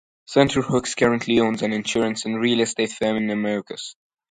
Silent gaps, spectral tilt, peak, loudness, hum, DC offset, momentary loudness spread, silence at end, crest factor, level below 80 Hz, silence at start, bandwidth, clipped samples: none; -4.5 dB/octave; -2 dBFS; -21 LUFS; none; under 0.1%; 7 LU; 0.4 s; 20 dB; -54 dBFS; 0.3 s; 9.6 kHz; under 0.1%